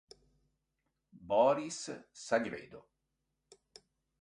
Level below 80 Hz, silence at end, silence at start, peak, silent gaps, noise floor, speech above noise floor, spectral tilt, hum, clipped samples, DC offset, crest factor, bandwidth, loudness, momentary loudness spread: -74 dBFS; 1.4 s; 1.15 s; -16 dBFS; none; -85 dBFS; 51 dB; -4 dB/octave; none; under 0.1%; under 0.1%; 22 dB; 11 kHz; -33 LUFS; 18 LU